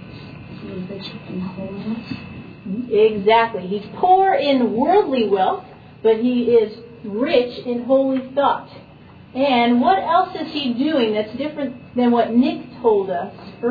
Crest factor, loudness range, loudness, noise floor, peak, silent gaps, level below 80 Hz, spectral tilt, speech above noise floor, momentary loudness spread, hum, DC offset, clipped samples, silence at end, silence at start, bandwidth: 16 dB; 4 LU; -19 LUFS; -43 dBFS; -4 dBFS; none; -56 dBFS; -8 dB/octave; 25 dB; 16 LU; none; under 0.1%; under 0.1%; 0 s; 0 s; 5 kHz